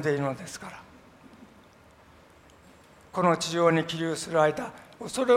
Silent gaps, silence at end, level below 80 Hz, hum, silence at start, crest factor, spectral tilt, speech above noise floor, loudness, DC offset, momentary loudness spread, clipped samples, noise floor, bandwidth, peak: none; 0 s; -64 dBFS; none; 0 s; 22 dB; -5 dB/octave; 29 dB; -27 LUFS; under 0.1%; 17 LU; under 0.1%; -55 dBFS; 16 kHz; -8 dBFS